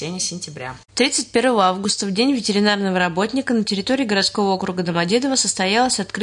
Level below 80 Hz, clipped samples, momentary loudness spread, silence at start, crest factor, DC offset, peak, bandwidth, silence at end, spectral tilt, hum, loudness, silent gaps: -56 dBFS; under 0.1%; 7 LU; 0 s; 16 dB; under 0.1%; -4 dBFS; 11 kHz; 0 s; -3.5 dB/octave; none; -19 LUFS; none